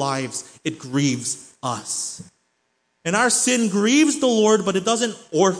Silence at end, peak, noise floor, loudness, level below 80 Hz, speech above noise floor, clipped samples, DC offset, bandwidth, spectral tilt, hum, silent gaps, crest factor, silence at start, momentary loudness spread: 0 s; -4 dBFS; -70 dBFS; -20 LUFS; -68 dBFS; 50 dB; under 0.1%; under 0.1%; 10.5 kHz; -3.5 dB/octave; none; none; 18 dB; 0 s; 13 LU